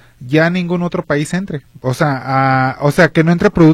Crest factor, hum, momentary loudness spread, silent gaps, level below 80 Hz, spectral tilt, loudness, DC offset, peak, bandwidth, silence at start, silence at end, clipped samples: 14 dB; none; 10 LU; none; -40 dBFS; -7 dB/octave; -14 LUFS; under 0.1%; 0 dBFS; 14 kHz; 0.2 s; 0 s; under 0.1%